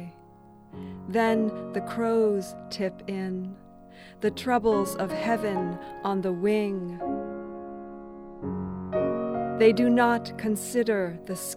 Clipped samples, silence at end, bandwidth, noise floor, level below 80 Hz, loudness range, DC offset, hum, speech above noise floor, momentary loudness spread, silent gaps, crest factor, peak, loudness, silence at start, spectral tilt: under 0.1%; 0 s; 16 kHz; -52 dBFS; -58 dBFS; 5 LU; under 0.1%; none; 26 dB; 18 LU; none; 20 dB; -8 dBFS; -27 LUFS; 0 s; -5.5 dB/octave